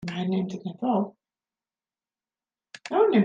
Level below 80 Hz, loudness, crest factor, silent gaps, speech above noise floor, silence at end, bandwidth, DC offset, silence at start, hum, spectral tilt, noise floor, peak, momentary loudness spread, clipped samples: -72 dBFS; -27 LUFS; 18 dB; none; over 66 dB; 0 s; 9.2 kHz; under 0.1%; 0 s; none; -7.5 dB/octave; under -90 dBFS; -10 dBFS; 11 LU; under 0.1%